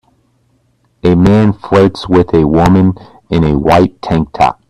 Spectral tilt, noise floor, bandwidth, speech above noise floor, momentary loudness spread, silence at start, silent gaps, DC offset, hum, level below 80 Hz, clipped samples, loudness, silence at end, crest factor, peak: -8 dB/octave; -56 dBFS; 12 kHz; 46 dB; 7 LU; 1.05 s; none; 0.2%; none; -32 dBFS; under 0.1%; -10 LUFS; 0.15 s; 10 dB; 0 dBFS